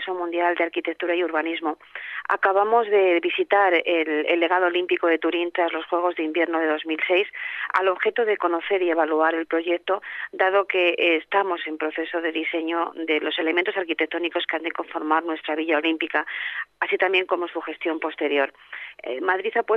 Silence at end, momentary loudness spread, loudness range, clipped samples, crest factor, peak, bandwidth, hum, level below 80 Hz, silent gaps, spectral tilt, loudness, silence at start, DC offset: 0 s; 9 LU; 4 LU; under 0.1%; 18 dB; -6 dBFS; 5.4 kHz; none; -76 dBFS; none; -4.5 dB/octave; -23 LUFS; 0 s; under 0.1%